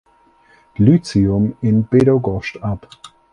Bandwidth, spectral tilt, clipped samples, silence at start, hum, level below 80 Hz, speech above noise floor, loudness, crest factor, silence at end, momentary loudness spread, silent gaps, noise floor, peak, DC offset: 10.5 kHz; -8.5 dB/octave; under 0.1%; 0.8 s; none; -40 dBFS; 38 dB; -16 LUFS; 16 dB; 0.25 s; 12 LU; none; -53 dBFS; 0 dBFS; under 0.1%